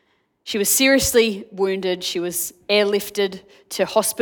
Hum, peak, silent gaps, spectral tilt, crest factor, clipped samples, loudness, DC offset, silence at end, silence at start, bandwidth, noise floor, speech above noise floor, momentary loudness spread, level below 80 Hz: none; -4 dBFS; none; -2.5 dB/octave; 18 dB; under 0.1%; -19 LUFS; under 0.1%; 0 s; 0.45 s; 19 kHz; -42 dBFS; 22 dB; 11 LU; -50 dBFS